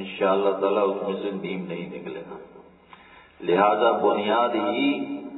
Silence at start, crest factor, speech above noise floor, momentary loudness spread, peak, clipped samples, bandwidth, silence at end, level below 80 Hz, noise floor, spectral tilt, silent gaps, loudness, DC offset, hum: 0 s; 20 dB; 27 dB; 15 LU; -6 dBFS; under 0.1%; 4.1 kHz; 0 s; -70 dBFS; -50 dBFS; -9 dB/octave; none; -23 LUFS; under 0.1%; none